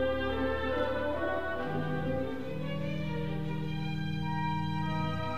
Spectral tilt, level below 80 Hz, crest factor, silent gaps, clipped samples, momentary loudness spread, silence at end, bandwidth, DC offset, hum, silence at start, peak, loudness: -7.5 dB/octave; -48 dBFS; 14 dB; none; under 0.1%; 4 LU; 0 s; 14.5 kHz; 0.9%; none; 0 s; -20 dBFS; -34 LUFS